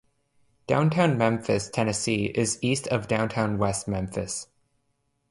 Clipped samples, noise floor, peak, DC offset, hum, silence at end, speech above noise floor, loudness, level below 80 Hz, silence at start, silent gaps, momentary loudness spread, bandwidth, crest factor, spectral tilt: under 0.1%; -73 dBFS; -8 dBFS; under 0.1%; none; 0.85 s; 48 dB; -26 LUFS; -52 dBFS; 0.7 s; none; 8 LU; 11.5 kHz; 18 dB; -5 dB/octave